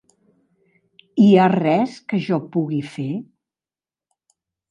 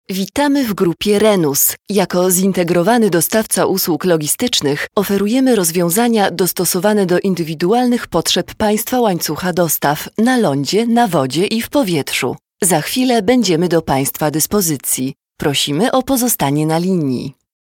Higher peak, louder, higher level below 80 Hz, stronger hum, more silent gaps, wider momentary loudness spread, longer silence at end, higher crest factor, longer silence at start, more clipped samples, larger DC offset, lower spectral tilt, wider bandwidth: about the same, -2 dBFS vs 0 dBFS; second, -19 LUFS vs -15 LUFS; second, -68 dBFS vs -48 dBFS; neither; neither; first, 15 LU vs 5 LU; first, 1.5 s vs 0.35 s; about the same, 18 dB vs 14 dB; first, 1.15 s vs 0.1 s; neither; neither; first, -8 dB/octave vs -4 dB/octave; second, 8.8 kHz vs 19 kHz